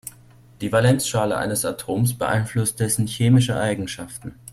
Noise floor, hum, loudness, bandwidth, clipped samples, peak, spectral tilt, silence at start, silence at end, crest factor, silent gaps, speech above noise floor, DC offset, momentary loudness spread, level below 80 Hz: -49 dBFS; none; -21 LUFS; 15.5 kHz; under 0.1%; -6 dBFS; -5 dB/octave; 0.05 s; 0 s; 16 dB; none; 28 dB; under 0.1%; 14 LU; -50 dBFS